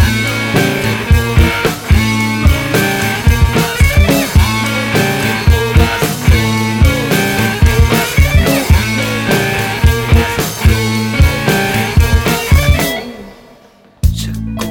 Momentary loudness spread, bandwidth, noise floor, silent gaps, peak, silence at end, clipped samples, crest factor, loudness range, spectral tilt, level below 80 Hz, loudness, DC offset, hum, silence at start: 4 LU; 18 kHz; -43 dBFS; none; 0 dBFS; 0 s; under 0.1%; 12 dB; 1 LU; -5 dB/octave; -16 dBFS; -12 LUFS; under 0.1%; none; 0 s